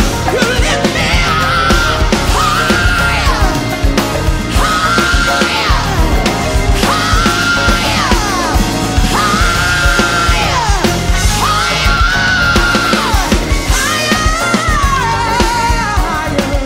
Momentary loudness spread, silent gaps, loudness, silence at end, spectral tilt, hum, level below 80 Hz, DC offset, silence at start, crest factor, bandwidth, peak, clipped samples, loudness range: 3 LU; none; -12 LUFS; 0 s; -4 dB/octave; none; -18 dBFS; under 0.1%; 0 s; 12 dB; 16.5 kHz; 0 dBFS; under 0.1%; 1 LU